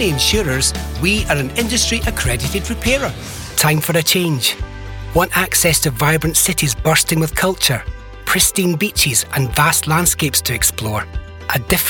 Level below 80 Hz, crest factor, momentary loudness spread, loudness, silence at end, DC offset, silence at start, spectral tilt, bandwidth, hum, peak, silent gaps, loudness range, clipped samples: -30 dBFS; 16 dB; 9 LU; -15 LUFS; 0 s; under 0.1%; 0 s; -3 dB/octave; 19 kHz; none; -2 dBFS; none; 2 LU; under 0.1%